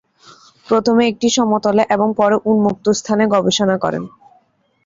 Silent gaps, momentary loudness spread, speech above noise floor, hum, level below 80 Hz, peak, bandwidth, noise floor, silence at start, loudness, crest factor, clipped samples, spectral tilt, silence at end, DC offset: none; 5 LU; 43 dB; none; -56 dBFS; -2 dBFS; 7.8 kHz; -58 dBFS; 0.7 s; -15 LUFS; 14 dB; under 0.1%; -4.5 dB/octave; 0.8 s; under 0.1%